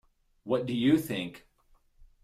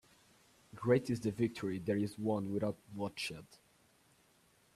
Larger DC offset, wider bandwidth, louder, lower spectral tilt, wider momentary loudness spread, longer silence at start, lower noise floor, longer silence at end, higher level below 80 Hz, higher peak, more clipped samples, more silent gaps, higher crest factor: neither; first, 16 kHz vs 14 kHz; first, -29 LUFS vs -37 LUFS; about the same, -6.5 dB/octave vs -6.5 dB/octave; first, 15 LU vs 10 LU; second, 0.45 s vs 0.75 s; second, -65 dBFS vs -70 dBFS; second, 0.2 s vs 1.2 s; first, -62 dBFS vs -72 dBFS; first, -12 dBFS vs -16 dBFS; neither; neither; about the same, 20 dB vs 22 dB